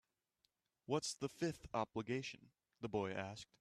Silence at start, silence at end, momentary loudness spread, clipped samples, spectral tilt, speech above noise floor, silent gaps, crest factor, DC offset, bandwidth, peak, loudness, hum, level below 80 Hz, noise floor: 0.9 s; 0.15 s; 10 LU; under 0.1%; -4.5 dB/octave; 41 dB; none; 20 dB; under 0.1%; 13.5 kHz; -24 dBFS; -44 LUFS; none; -72 dBFS; -85 dBFS